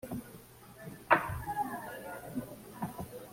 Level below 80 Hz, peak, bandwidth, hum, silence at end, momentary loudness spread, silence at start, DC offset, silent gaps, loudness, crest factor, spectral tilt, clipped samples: -58 dBFS; -10 dBFS; 16.5 kHz; none; 0 s; 21 LU; 0.05 s; under 0.1%; none; -36 LUFS; 26 dB; -5.5 dB/octave; under 0.1%